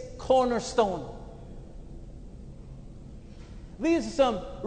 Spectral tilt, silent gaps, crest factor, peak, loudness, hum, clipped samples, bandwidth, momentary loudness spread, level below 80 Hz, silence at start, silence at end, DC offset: -5 dB/octave; none; 20 dB; -10 dBFS; -26 LUFS; none; under 0.1%; 9.4 kHz; 23 LU; -46 dBFS; 0 s; 0 s; under 0.1%